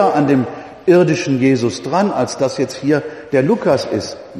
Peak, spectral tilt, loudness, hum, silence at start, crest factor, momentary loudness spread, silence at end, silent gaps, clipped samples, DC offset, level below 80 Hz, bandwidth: 0 dBFS; -6 dB/octave; -16 LUFS; none; 0 s; 14 dB; 7 LU; 0 s; none; under 0.1%; under 0.1%; -56 dBFS; 12.5 kHz